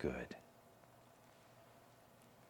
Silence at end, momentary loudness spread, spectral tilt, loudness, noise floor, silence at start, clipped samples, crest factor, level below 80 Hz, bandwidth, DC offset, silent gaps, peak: 0 s; 16 LU; -6.5 dB/octave; -55 LUFS; -65 dBFS; 0 s; under 0.1%; 26 dB; -66 dBFS; 19 kHz; under 0.1%; none; -26 dBFS